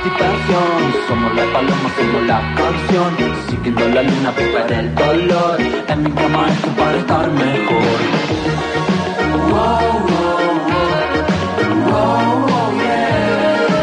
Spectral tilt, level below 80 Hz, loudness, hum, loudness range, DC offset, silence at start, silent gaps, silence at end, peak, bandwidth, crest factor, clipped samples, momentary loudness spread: -6.5 dB/octave; -36 dBFS; -15 LUFS; none; 1 LU; under 0.1%; 0 s; none; 0 s; -2 dBFS; 10 kHz; 12 dB; under 0.1%; 3 LU